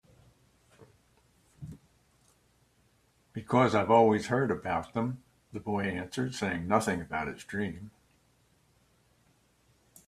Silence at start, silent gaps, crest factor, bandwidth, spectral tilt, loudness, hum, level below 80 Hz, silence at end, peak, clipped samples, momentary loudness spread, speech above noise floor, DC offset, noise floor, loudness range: 0.8 s; none; 24 dB; 14.5 kHz; -6 dB/octave; -30 LUFS; none; -64 dBFS; 2.2 s; -8 dBFS; under 0.1%; 23 LU; 39 dB; under 0.1%; -68 dBFS; 7 LU